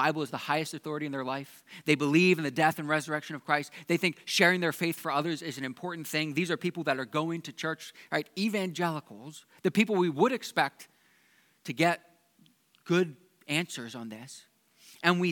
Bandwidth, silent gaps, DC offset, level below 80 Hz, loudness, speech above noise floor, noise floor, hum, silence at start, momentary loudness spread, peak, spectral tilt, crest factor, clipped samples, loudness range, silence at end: 19 kHz; none; under 0.1%; -88 dBFS; -29 LUFS; 36 dB; -66 dBFS; none; 0 s; 15 LU; -6 dBFS; -5 dB/octave; 24 dB; under 0.1%; 6 LU; 0 s